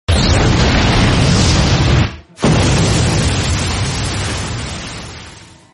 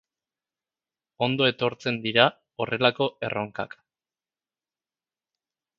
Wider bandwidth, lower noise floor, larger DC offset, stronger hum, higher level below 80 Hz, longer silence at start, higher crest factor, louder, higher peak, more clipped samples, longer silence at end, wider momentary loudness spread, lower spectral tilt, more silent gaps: first, 11.5 kHz vs 7.4 kHz; second, -37 dBFS vs under -90 dBFS; neither; neither; first, -22 dBFS vs -68 dBFS; second, 0.1 s vs 1.2 s; second, 12 dB vs 28 dB; first, -14 LUFS vs -25 LUFS; about the same, -2 dBFS vs -2 dBFS; neither; second, 0.35 s vs 2.1 s; about the same, 12 LU vs 12 LU; second, -4.5 dB/octave vs -6 dB/octave; neither